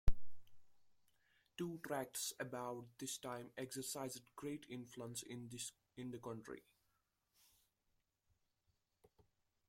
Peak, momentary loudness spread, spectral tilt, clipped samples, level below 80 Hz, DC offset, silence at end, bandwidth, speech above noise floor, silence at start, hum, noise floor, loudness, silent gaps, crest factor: -18 dBFS; 8 LU; -4 dB/octave; under 0.1%; -52 dBFS; under 0.1%; 3.1 s; 16.5 kHz; 36 dB; 0.05 s; none; -85 dBFS; -48 LUFS; none; 26 dB